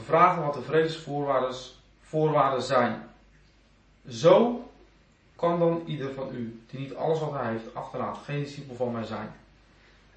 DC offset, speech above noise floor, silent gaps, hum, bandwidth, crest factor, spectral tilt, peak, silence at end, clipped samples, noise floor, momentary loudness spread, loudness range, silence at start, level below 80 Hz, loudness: under 0.1%; 34 dB; none; none; 8.6 kHz; 22 dB; -6.5 dB/octave; -4 dBFS; 0.85 s; under 0.1%; -60 dBFS; 17 LU; 7 LU; 0 s; -62 dBFS; -27 LUFS